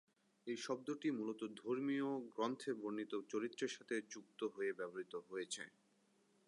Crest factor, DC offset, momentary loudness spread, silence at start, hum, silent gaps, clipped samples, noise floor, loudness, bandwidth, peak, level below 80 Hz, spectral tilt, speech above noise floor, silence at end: 18 dB; under 0.1%; 7 LU; 0.45 s; none; none; under 0.1%; -77 dBFS; -45 LUFS; 11 kHz; -28 dBFS; under -90 dBFS; -4 dB/octave; 33 dB; 0.8 s